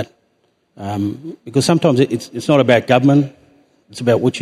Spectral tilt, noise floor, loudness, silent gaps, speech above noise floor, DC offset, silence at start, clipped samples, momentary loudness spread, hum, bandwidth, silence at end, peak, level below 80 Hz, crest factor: -6 dB/octave; -62 dBFS; -16 LUFS; none; 47 dB; under 0.1%; 0 s; under 0.1%; 17 LU; none; 13.5 kHz; 0 s; 0 dBFS; -60 dBFS; 16 dB